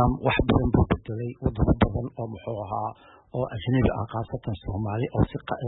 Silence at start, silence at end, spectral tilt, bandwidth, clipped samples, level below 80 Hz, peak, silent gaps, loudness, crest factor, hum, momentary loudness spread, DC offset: 0 s; 0 s; -12 dB/octave; 4.1 kHz; under 0.1%; -36 dBFS; -8 dBFS; none; -27 LUFS; 18 dB; none; 11 LU; under 0.1%